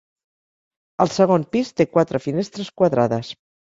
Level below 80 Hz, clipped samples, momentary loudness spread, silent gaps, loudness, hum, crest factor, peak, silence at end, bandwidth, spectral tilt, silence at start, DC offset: -58 dBFS; under 0.1%; 10 LU; none; -20 LUFS; none; 18 dB; -2 dBFS; 0.35 s; 7.8 kHz; -6.5 dB/octave; 1 s; under 0.1%